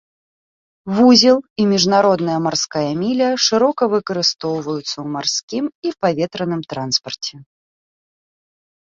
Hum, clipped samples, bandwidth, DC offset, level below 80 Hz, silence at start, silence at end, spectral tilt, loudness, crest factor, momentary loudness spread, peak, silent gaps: none; under 0.1%; 7.6 kHz; under 0.1%; -60 dBFS; 0.85 s; 1.4 s; -4 dB/octave; -17 LUFS; 18 dB; 12 LU; 0 dBFS; 1.50-1.56 s, 5.43-5.48 s, 5.75-5.82 s